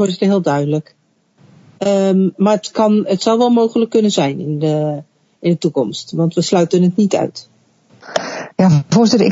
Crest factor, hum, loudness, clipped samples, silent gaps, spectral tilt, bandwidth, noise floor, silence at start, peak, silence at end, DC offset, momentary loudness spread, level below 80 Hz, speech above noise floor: 14 dB; none; -15 LUFS; under 0.1%; none; -6.5 dB/octave; 8 kHz; -52 dBFS; 0 s; 0 dBFS; 0 s; under 0.1%; 10 LU; -62 dBFS; 39 dB